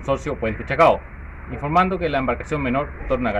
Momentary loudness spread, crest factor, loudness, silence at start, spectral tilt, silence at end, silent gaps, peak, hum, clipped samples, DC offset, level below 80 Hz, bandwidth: 14 LU; 16 dB; -21 LUFS; 0 s; -7 dB/octave; 0 s; none; -6 dBFS; none; under 0.1%; under 0.1%; -36 dBFS; 11 kHz